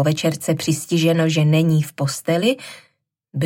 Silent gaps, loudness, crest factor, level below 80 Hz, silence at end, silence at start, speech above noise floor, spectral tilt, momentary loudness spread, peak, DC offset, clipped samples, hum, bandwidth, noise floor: none; -19 LUFS; 14 dB; -64 dBFS; 0 s; 0 s; 33 dB; -5.5 dB/octave; 9 LU; -4 dBFS; under 0.1%; under 0.1%; none; 16.5 kHz; -51 dBFS